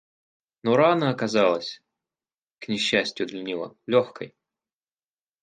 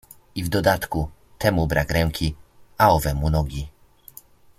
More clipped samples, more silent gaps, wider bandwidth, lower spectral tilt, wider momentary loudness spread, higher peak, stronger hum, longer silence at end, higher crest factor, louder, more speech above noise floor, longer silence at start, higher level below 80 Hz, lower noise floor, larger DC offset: neither; neither; second, 9.6 kHz vs 16 kHz; about the same, -5 dB/octave vs -6 dB/octave; first, 18 LU vs 14 LU; about the same, -6 dBFS vs -4 dBFS; neither; first, 1.15 s vs 0.9 s; about the same, 20 dB vs 20 dB; about the same, -24 LUFS vs -22 LUFS; first, over 66 dB vs 27 dB; first, 0.65 s vs 0.35 s; second, -68 dBFS vs -34 dBFS; first, under -90 dBFS vs -48 dBFS; neither